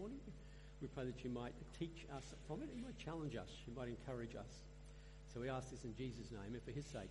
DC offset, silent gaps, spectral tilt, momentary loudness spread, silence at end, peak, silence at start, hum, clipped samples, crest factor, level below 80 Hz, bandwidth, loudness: under 0.1%; none; -6 dB/octave; 11 LU; 0 s; -32 dBFS; 0 s; none; under 0.1%; 18 dB; -60 dBFS; 11.5 kHz; -51 LUFS